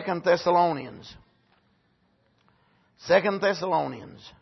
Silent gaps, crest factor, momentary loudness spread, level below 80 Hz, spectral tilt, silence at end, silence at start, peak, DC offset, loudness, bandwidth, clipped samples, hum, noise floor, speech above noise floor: none; 20 dB; 23 LU; -66 dBFS; -5.5 dB/octave; 0.1 s; 0 s; -6 dBFS; under 0.1%; -24 LUFS; 6.2 kHz; under 0.1%; none; -67 dBFS; 42 dB